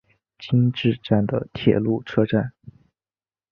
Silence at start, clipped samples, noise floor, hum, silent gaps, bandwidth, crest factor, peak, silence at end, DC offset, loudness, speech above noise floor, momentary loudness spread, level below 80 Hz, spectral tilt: 0.4 s; under 0.1%; under -90 dBFS; none; none; 6.2 kHz; 20 dB; -2 dBFS; 0.8 s; under 0.1%; -22 LUFS; over 69 dB; 5 LU; -52 dBFS; -9.5 dB/octave